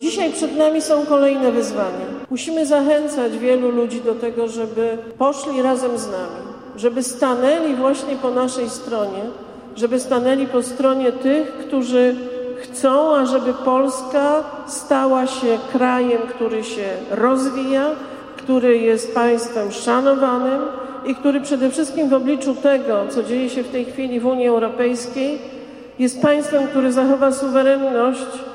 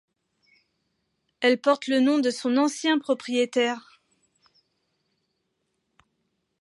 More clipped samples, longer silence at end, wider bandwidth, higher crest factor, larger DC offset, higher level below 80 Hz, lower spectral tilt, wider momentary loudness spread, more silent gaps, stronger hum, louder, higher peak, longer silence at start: neither; second, 0 s vs 2.8 s; first, 14.5 kHz vs 11.5 kHz; about the same, 16 dB vs 20 dB; neither; first, -60 dBFS vs -82 dBFS; about the same, -4 dB/octave vs -3 dB/octave; first, 10 LU vs 4 LU; neither; neither; first, -19 LUFS vs -24 LUFS; first, -2 dBFS vs -8 dBFS; second, 0 s vs 1.4 s